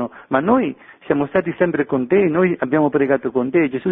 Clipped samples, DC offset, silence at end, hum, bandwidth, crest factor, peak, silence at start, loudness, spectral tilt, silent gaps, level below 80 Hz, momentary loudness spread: under 0.1%; under 0.1%; 0 s; none; 3.8 kHz; 16 dB; -2 dBFS; 0 s; -18 LUFS; -11.5 dB/octave; none; -54 dBFS; 5 LU